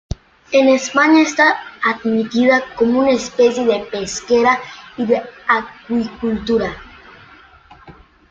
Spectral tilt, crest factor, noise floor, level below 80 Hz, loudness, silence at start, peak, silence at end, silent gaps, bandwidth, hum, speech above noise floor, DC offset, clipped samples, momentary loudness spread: -4 dB/octave; 16 dB; -45 dBFS; -44 dBFS; -16 LUFS; 0.1 s; 0 dBFS; 0.4 s; none; 7.8 kHz; none; 29 dB; under 0.1%; under 0.1%; 11 LU